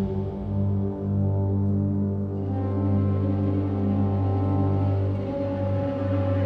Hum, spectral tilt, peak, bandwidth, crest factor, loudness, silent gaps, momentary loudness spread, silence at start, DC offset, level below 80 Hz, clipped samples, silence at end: 50 Hz at -45 dBFS; -11.5 dB/octave; -12 dBFS; 4.2 kHz; 12 dB; -25 LUFS; none; 4 LU; 0 s; under 0.1%; -46 dBFS; under 0.1%; 0 s